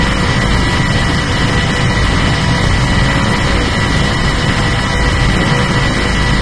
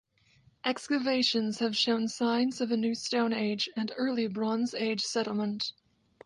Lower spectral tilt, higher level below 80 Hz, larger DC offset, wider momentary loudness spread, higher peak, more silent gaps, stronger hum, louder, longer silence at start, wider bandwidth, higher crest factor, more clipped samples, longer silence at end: about the same, -5 dB/octave vs -4 dB/octave; first, -18 dBFS vs -76 dBFS; first, 2% vs under 0.1%; second, 1 LU vs 6 LU; first, 0 dBFS vs -14 dBFS; neither; neither; first, -13 LUFS vs -30 LUFS; second, 0 s vs 0.65 s; about the same, 11 kHz vs 11.5 kHz; second, 12 dB vs 18 dB; neither; second, 0 s vs 0.55 s